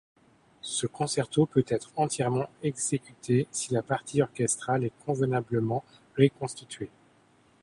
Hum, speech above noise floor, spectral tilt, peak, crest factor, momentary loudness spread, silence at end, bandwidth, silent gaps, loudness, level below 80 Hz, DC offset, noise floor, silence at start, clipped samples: none; 34 dB; -5 dB/octave; -6 dBFS; 22 dB; 12 LU; 0.75 s; 11.5 kHz; none; -29 LUFS; -64 dBFS; under 0.1%; -62 dBFS; 0.65 s; under 0.1%